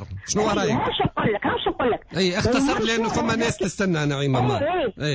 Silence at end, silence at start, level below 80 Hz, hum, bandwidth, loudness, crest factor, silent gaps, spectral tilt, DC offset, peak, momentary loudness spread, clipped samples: 0 s; 0 s; -44 dBFS; none; 8 kHz; -22 LUFS; 14 dB; none; -5 dB/octave; under 0.1%; -10 dBFS; 3 LU; under 0.1%